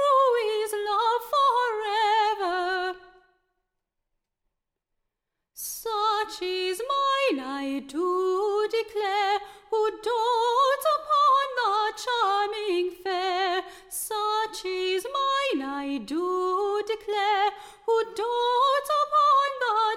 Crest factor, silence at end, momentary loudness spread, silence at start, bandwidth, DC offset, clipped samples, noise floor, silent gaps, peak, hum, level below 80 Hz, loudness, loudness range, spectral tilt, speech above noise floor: 14 dB; 0 s; 9 LU; 0 s; 16 kHz; under 0.1%; under 0.1%; -83 dBFS; none; -12 dBFS; none; -66 dBFS; -25 LUFS; 8 LU; -1.5 dB/octave; 55 dB